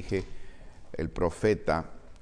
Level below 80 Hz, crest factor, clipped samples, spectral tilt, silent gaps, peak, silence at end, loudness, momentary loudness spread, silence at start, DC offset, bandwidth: -44 dBFS; 18 dB; under 0.1%; -6.5 dB/octave; none; -12 dBFS; 0 s; -30 LUFS; 18 LU; 0 s; under 0.1%; 10.5 kHz